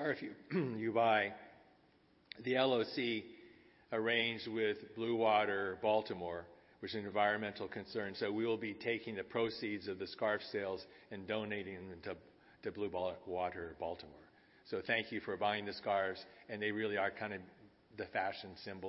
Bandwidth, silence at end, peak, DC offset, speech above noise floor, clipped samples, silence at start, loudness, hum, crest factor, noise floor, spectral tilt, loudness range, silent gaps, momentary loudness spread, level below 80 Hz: 5.8 kHz; 0 s; -18 dBFS; under 0.1%; 31 dB; under 0.1%; 0 s; -38 LUFS; none; 22 dB; -70 dBFS; -2.5 dB/octave; 6 LU; none; 15 LU; -76 dBFS